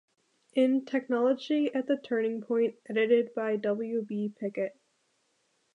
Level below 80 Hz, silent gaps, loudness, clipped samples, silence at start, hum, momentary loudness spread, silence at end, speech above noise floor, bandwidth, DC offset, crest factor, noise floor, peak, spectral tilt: -86 dBFS; none; -29 LUFS; under 0.1%; 0.55 s; none; 8 LU; 1.05 s; 45 dB; 9.2 kHz; under 0.1%; 16 dB; -74 dBFS; -14 dBFS; -7 dB/octave